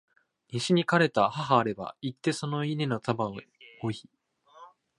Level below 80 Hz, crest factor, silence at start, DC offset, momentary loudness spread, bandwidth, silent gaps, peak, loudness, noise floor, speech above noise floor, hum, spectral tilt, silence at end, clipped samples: -68 dBFS; 22 dB; 0.5 s; under 0.1%; 13 LU; 11.5 kHz; none; -8 dBFS; -28 LUFS; -54 dBFS; 27 dB; none; -5.5 dB/octave; 0.3 s; under 0.1%